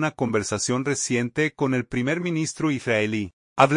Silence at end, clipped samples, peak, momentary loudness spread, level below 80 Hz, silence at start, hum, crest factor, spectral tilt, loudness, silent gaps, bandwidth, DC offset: 0 s; under 0.1%; -2 dBFS; 3 LU; -58 dBFS; 0 s; none; 22 dB; -4.5 dB/octave; -24 LUFS; 3.33-3.56 s; 11 kHz; under 0.1%